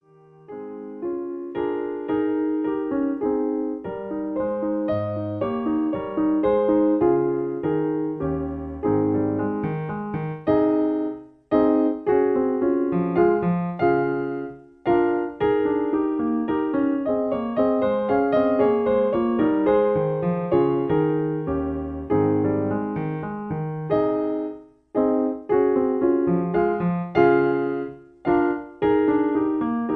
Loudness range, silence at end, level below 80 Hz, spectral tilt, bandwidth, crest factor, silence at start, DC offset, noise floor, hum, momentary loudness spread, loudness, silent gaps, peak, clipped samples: 4 LU; 0 s; -50 dBFS; -11 dB/octave; 4.6 kHz; 16 dB; 0.5 s; under 0.1%; -50 dBFS; none; 10 LU; -23 LUFS; none; -6 dBFS; under 0.1%